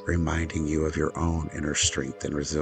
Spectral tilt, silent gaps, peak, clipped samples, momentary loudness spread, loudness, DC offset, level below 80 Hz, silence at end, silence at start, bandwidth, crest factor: -4 dB/octave; none; -10 dBFS; under 0.1%; 7 LU; -27 LUFS; under 0.1%; -38 dBFS; 0 s; 0 s; 9.4 kHz; 16 dB